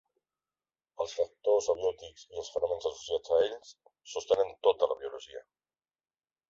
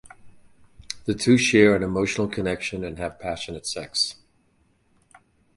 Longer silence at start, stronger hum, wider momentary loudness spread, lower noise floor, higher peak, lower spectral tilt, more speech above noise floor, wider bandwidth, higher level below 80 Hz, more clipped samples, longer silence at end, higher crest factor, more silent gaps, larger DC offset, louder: first, 1 s vs 0.05 s; neither; first, 17 LU vs 14 LU; first, under -90 dBFS vs -64 dBFS; second, -10 dBFS vs -2 dBFS; second, -2.5 dB/octave vs -4.5 dB/octave; first, over 59 dB vs 42 dB; second, 7.8 kHz vs 11.5 kHz; second, -68 dBFS vs -50 dBFS; neither; second, 1.1 s vs 1.45 s; about the same, 22 dB vs 24 dB; neither; neither; second, -31 LUFS vs -23 LUFS